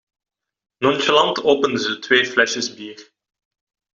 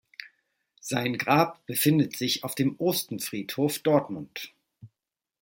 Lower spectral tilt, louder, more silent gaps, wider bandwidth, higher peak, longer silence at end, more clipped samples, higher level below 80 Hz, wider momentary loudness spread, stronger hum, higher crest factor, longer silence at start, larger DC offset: second, -3 dB/octave vs -4.5 dB/octave; first, -18 LUFS vs -26 LUFS; neither; second, 7.6 kHz vs 17 kHz; first, -2 dBFS vs -6 dBFS; first, 0.95 s vs 0.55 s; neither; about the same, -64 dBFS vs -68 dBFS; second, 11 LU vs 16 LU; neither; about the same, 18 dB vs 22 dB; first, 0.8 s vs 0.2 s; neither